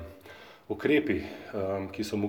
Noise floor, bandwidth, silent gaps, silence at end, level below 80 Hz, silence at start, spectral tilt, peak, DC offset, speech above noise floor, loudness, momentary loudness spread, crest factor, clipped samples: -50 dBFS; 19.5 kHz; none; 0 s; -60 dBFS; 0 s; -6 dB/octave; -12 dBFS; under 0.1%; 21 dB; -30 LUFS; 22 LU; 18 dB; under 0.1%